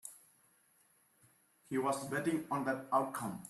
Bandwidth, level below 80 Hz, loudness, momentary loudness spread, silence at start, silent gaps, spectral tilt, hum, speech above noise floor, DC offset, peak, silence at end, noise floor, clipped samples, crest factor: 14.5 kHz; -80 dBFS; -36 LUFS; 6 LU; 0.05 s; none; -5 dB/octave; none; 35 dB; under 0.1%; -20 dBFS; 0 s; -71 dBFS; under 0.1%; 20 dB